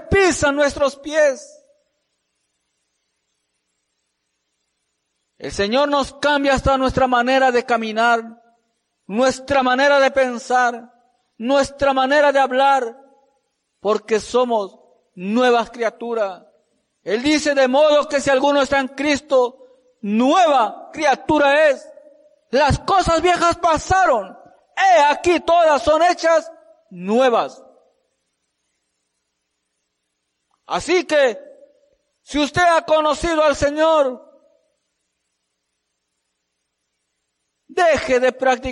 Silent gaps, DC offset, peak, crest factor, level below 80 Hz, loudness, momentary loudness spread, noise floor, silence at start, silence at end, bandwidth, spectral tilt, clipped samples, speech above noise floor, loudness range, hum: none; under 0.1%; -6 dBFS; 12 dB; -42 dBFS; -17 LUFS; 10 LU; -75 dBFS; 0 s; 0 s; 11.5 kHz; -4 dB/octave; under 0.1%; 58 dB; 8 LU; none